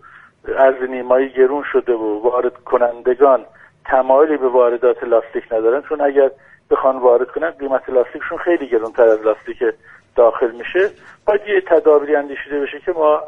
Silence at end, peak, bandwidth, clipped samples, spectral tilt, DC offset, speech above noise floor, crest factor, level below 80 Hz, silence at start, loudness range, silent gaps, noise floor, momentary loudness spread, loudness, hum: 0 s; 0 dBFS; 3.7 kHz; under 0.1%; -6.5 dB/octave; under 0.1%; 19 dB; 16 dB; -52 dBFS; 0.45 s; 2 LU; none; -35 dBFS; 9 LU; -16 LUFS; none